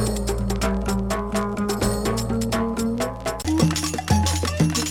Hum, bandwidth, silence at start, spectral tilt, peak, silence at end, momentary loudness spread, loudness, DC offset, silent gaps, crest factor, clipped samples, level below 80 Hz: none; 18.5 kHz; 0 s; -5 dB/octave; -4 dBFS; 0 s; 4 LU; -23 LUFS; under 0.1%; none; 18 dB; under 0.1%; -32 dBFS